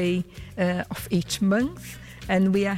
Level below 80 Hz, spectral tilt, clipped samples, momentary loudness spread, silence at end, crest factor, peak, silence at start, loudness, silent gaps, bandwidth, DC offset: -48 dBFS; -6 dB/octave; under 0.1%; 16 LU; 0 s; 12 dB; -12 dBFS; 0 s; -25 LUFS; none; 16 kHz; under 0.1%